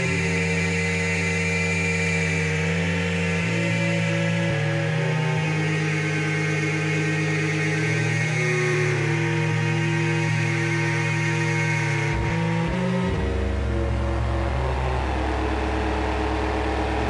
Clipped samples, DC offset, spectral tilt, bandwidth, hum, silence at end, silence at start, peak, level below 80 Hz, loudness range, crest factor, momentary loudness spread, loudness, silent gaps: under 0.1%; under 0.1%; -5.5 dB/octave; 11.5 kHz; none; 0 s; 0 s; -12 dBFS; -34 dBFS; 3 LU; 10 dB; 3 LU; -23 LUFS; none